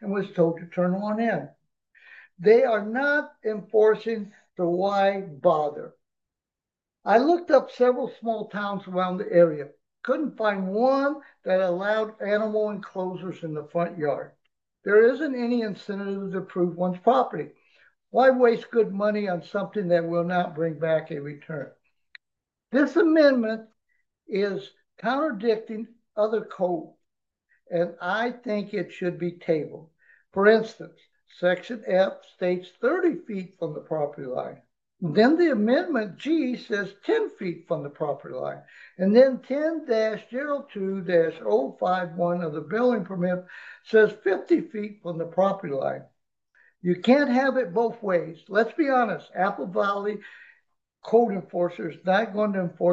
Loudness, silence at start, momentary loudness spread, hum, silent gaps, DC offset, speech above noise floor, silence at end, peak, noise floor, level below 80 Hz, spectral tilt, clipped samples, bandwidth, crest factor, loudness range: -25 LUFS; 0 s; 14 LU; none; none; under 0.1%; 65 dB; 0 s; -6 dBFS; -90 dBFS; -78 dBFS; -7.5 dB/octave; under 0.1%; 7.4 kHz; 20 dB; 4 LU